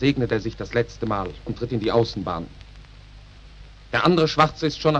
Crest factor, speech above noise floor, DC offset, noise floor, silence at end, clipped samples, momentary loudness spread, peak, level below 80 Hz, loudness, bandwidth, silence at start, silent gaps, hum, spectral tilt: 20 dB; 22 dB; under 0.1%; -44 dBFS; 0 s; under 0.1%; 12 LU; -4 dBFS; -44 dBFS; -23 LUFS; 9.4 kHz; 0 s; none; none; -6.5 dB/octave